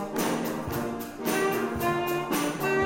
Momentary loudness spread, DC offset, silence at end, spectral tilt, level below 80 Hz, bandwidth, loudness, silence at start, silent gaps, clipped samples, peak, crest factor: 5 LU; under 0.1%; 0 s; -4.5 dB/octave; -54 dBFS; 16.5 kHz; -28 LUFS; 0 s; none; under 0.1%; -14 dBFS; 14 dB